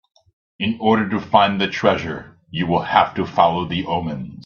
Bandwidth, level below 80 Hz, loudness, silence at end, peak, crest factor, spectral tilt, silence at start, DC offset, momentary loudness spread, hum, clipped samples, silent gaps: 7 kHz; -52 dBFS; -19 LUFS; 0.05 s; 0 dBFS; 20 dB; -6.5 dB/octave; 0.6 s; under 0.1%; 10 LU; none; under 0.1%; none